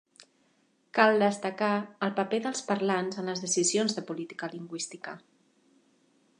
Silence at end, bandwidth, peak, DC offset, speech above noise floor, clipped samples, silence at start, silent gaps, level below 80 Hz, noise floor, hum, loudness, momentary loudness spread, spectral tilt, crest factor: 1.2 s; 11 kHz; -6 dBFS; under 0.1%; 40 dB; under 0.1%; 0.95 s; none; -82 dBFS; -69 dBFS; none; -29 LUFS; 14 LU; -3.5 dB/octave; 24 dB